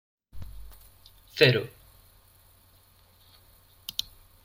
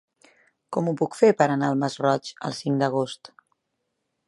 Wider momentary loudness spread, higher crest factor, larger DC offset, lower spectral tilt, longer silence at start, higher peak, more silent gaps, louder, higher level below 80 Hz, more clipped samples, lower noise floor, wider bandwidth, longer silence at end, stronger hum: first, 28 LU vs 12 LU; first, 28 dB vs 22 dB; neither; about the same, -5 dB/octave vs -6 dB/octave; second, 0.35 s vs 0.7 s; about the same, -4 dBFS vs -4 dBFS; neither; about the same, -25 LUFS vs -24 LUFS; first, -54 dBFS vs -74 dBFS; neither; second, -59 dBFS vs -78 dBFS; first, 16.5 kHz vs 11.5 kHz; second, 0.4 s vs 1 s; neither